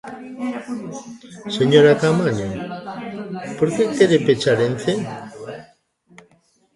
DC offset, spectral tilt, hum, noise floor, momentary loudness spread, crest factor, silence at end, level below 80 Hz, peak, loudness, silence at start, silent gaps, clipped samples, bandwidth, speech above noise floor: under 0.1%; -6 dB/octave; none; -59 dBFS; 21 LU; 20 dB; 1.1 s; -56 dBFS; 0 dBFS; -19 LUFS; 0.05 s; none; under 0.1%; 11.5 kHz; 41 dB